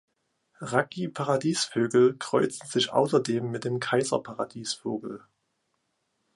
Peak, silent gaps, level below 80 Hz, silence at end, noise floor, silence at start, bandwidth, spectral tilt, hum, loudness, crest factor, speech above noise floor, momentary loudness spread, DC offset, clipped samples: -6 dBFS; none; -72 dBFS; 1.2 s; -77 dBFS; 0.6 s; 11.5 kHz; -4.5 dB/octave; none; -27 LUFS; 22 dB; 50 dB; 11 LU; under 0.1%; under 0.1%